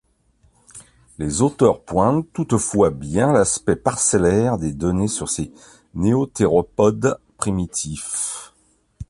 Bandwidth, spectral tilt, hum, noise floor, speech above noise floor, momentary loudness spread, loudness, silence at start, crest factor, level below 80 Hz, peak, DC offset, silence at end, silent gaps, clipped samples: 11.5 kHz; -5.5 dB/octave; none; -59 dBFS; 40 dB; 9 LU; -20 LUFS; 0.75 s; 18 dB; -42 dBFS; -2 dBFS; under 0.1%; 0.05 s; none; under 0.1%